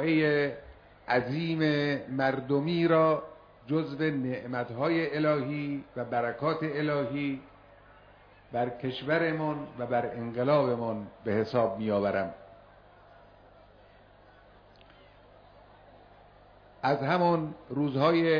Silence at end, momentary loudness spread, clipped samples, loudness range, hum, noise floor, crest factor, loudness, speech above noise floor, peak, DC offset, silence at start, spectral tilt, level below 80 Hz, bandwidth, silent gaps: 0 s; 10 LU; under 0.1%; 5 LU; 50 Hz at -60 dBFS; -57 dBFS; 18 dB; -29 LUFS; 28 dB; -12 dBFS; under 0.1%; 0 s; -8.5 dB/octave; -64 dBFS; 5.4 kHz; none